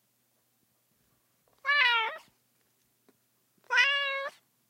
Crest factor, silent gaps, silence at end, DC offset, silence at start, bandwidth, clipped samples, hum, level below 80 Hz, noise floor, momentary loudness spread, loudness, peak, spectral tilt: 22 dB; none; 0.4 s; under 0.1%; 1.65 s; 16 kHz; under 0.1%; none; under -90 dBFS; -73 dBFS; 14 LU; -26 LUFS; -10 dBFS; 2 dB/octave